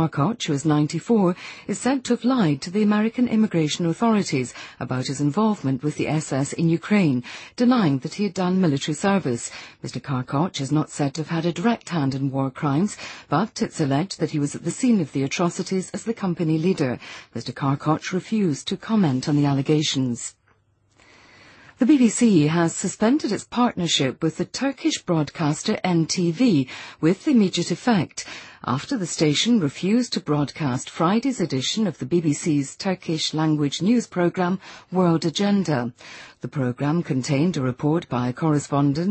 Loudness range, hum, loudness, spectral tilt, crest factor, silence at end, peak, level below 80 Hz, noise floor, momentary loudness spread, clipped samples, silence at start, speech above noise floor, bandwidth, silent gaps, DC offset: 3 LU; none; -22 LUFS; -5.5 dB/octave; 16 dB; 0 s; -6 dBFS; -60 dBFS; -62 dBFS; 7 LU; under 0.1%; 0 s; 40 dB; 8.8 kHz; none; under 0.1%